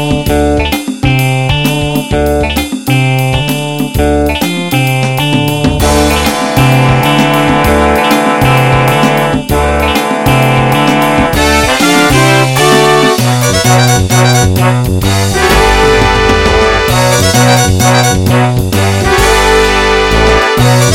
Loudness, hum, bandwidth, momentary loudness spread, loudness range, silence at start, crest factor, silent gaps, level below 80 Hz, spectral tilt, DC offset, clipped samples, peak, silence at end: -8 LUFS; none; 17 kHz; 5 LU; 4 LU; 0 s; 8 dB; none; -20 dBFS; -4.5 dB/octave; 2%; 0.2%; 0 dBFS; 0 s